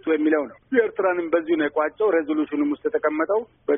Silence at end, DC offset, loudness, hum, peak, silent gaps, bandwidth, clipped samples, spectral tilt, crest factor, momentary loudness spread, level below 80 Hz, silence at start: 0 s; under 0.1%; -23 LUFS; none; -6 dBFS; none; 3.7 kHz; under 0.1%; 1 dB/octave; 16 dB; 4 LU; -66 dBFS; 0.05 s